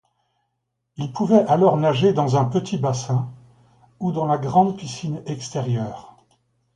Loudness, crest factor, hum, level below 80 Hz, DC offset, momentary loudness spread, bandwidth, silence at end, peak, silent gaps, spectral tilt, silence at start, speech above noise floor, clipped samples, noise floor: -21 LUFS; 18 dB; none; -60 dBFS; under 0.1%; 13 LU; 10.5 kHz; 0.7 s; -2 dBFS; none; -7 dB/octave; 1 s; 56 dB; under 0.1%; -76 dBFS